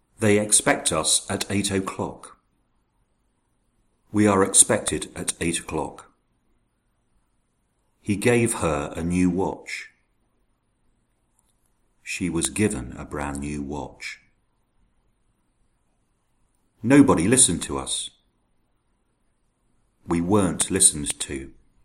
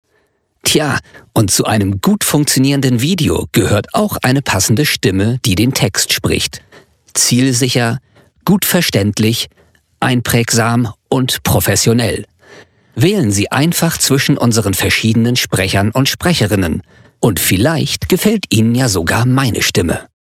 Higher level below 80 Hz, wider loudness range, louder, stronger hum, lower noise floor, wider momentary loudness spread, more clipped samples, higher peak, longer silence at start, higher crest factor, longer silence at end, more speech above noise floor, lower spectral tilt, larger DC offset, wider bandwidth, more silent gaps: second, -48 dBFS vs -38 dBFS; first, 10 LU vs 2 LU; second, -21 LUFS vs -13 LUFS; neither; first, -69 dBFS vs -60 dBFS; first, 17 LU vs 6 LU; neither; about the same, 0 dBFS vs -2 dBFS; second, 0.2 s vs 0.65 s; first, 26 dB vs 12 dB; about the same, 0.35 s vs 0.3 s; about the same, 47 dB vs 47 dB; about the same, -3.5 dB/octave vs -4 dB/octave; neither; about the same, 16 kHz vs 16.5 kHz; neither